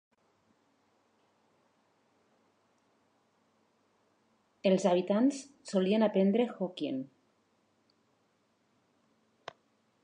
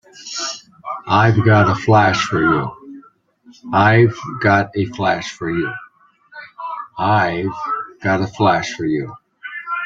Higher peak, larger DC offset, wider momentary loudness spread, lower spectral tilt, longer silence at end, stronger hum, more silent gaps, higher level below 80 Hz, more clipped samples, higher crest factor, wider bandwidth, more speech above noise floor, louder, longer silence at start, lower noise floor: second, -14 dBFS vs -2 dBFS; neither; second, 11 LU vs 18 LU; about the same, -6.5 dB/octave vs -6 dB/octave; first, 2.95 s vs 0 s; neither; neither; second, -88 dBFS vs -52 dBFS; neither; about the same, 20 dB vs 16 dB; first, 10 kHz vs 7.6 kHz; first, 44 dB vs 34 dB; second, -30 LUFS vs -17 LUFS; first, 4.65 s vs 0.15 s; first, -74 dBFS vs -50 dBFS